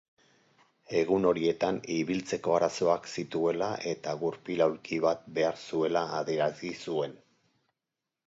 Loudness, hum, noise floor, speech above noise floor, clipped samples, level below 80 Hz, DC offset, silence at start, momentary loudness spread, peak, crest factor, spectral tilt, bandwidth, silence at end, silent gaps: -30 LUFS; none; -88 dBFS; 59 dB; under 0.1%; -68 dBFS; under 0.1%; 0.9 s; 7 LU; -12 dBFS; 18 dB; -5.5 dB/octave; 8 kHz; 1.15 s; none